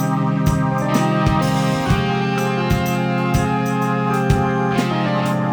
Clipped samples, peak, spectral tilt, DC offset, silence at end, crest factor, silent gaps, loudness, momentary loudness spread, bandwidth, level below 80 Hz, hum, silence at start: under 0.1%; -2 dBFS; -6.5 dB/octave; under 0.1%; 0 s; 14 dB; none; -18 LUFS; 2 LU; over 20 kHz; -32 dBFS; none; 0 s